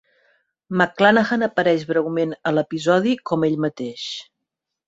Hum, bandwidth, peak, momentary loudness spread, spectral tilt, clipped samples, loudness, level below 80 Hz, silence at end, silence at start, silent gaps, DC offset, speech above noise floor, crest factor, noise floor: none; 8 kHz; -2 dBFS; 13 LU; -6 dB/octave; under 0.1%; -20 LUFS; -64 dBFS; 0.65 s; 0.7 s; none; under 0.1%; 62 dB; 20 dB; -82 dBFS